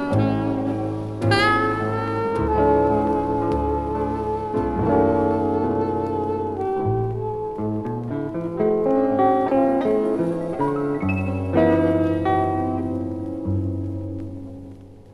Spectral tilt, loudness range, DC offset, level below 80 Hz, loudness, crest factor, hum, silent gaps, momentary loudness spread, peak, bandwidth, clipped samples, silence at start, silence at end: -8 dB/octave; 3 LU; under 0.1%; -40 dBFS; -22 LUFS; 18 dB; none; none; 9 LU; -4 dBFS; 11.5 kHz; under 0.1%; 0 s; 0 s